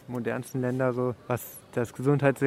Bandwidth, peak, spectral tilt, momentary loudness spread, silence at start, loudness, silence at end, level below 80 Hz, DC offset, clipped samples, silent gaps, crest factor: 16 kHz; -8 dBFS; -7.5 dB/octave; 9 LU; 0.1 s; -29 LUFS; 0 s; -64 dBFS; under 0.1%; under 0.1%; none; 18 dB